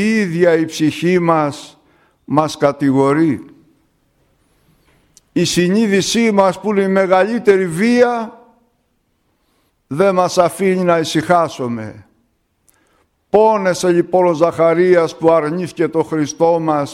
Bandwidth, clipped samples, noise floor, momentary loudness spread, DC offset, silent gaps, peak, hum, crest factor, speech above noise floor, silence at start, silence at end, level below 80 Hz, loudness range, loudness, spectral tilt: 14.5 kHz; under 0.1%; -64 dBFS; 7 LU; under 0.1%; none; 0 dBFS; none; 16 dB; 50 dB; 0 s; 0 s; -56 dBFS; 5 LU; -14 LUFS; -5.5 dB/octave